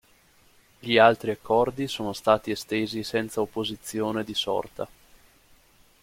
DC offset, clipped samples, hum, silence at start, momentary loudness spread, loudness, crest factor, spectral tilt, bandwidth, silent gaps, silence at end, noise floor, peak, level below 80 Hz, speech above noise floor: under 0.1%; under 0.1%; none; 0.85 s; 12 LU; -25 LUFS; 24 dB; -4.5 dB/octave; 16.5 kHz; none; 1.15 s; -59 dBFS; -4 dBFS; -58 dBFS; 34 dB